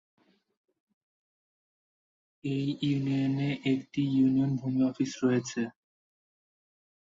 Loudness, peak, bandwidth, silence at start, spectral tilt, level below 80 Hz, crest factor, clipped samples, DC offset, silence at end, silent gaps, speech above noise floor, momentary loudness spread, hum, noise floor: -29 LUFS; -14 dBFS; 7.6 kHz; 2.45 s; -6.5 dB/octave; -70 dBFS; 16 dB; under 0.1%; under 0.1%; 1.5 s; none; over 62 dB; 9 LU; none; under -90 dBFS